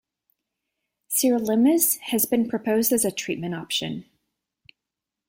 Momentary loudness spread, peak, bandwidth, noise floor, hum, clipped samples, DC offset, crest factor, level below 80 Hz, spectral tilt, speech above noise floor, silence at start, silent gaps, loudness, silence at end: 10 LU; -6 dBFS; 16.5 kHz; -86 dBFS; none; under 0.1%; under 0.1%; 18 dB; -66 dBFS; -3.5 dB/octave; 64 dB; 1.1 s; none; -22 LUFS; 1.25 s